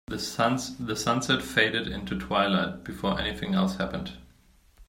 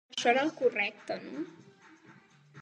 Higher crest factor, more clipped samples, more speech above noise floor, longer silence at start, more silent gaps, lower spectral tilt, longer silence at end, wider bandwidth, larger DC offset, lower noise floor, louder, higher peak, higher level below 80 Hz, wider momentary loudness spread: about the same, 22 dB vs 20 dB; neither; first, 32 dB vs 28 dB; about the same, 0.1 s vs 0.1 s; neither; first, -4.5 dB/octave vs -3 dB/octave; about the same, 0.05 s vs 0 s; first, 16 kHz vs 9.6 kHz; neither; about the same, -59 dBFS vs -58 dBFS; first, -27 LUFS vs -31 LUFS; first, -6 dBFS vs -12 dBFS; first, -48 dBFS vs -86 dBFS; second, 9 LU vs 14 LU